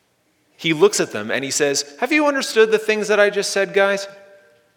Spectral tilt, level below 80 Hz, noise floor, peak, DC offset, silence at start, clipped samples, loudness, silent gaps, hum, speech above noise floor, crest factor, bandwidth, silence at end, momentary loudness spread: -2.5 dB/octave; -78 dBFS; -63 dBFS; 0 dBFS; under 0.1%; 0.6 s; under 0.1%; -18 LUFS; none; none; 45 dB; 18 dB; 17.5 kHz; 0.6 s; 7 LU